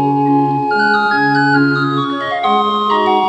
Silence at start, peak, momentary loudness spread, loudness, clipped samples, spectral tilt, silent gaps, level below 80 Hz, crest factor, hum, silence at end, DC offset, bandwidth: 0 s; 0 dBFS; 4 LU; -13 LUFS; under 0.1%; -7 dB/octave; none; -60 dBFS; 12 dB; none; 0 s; under 0.1%; 8.8 kHz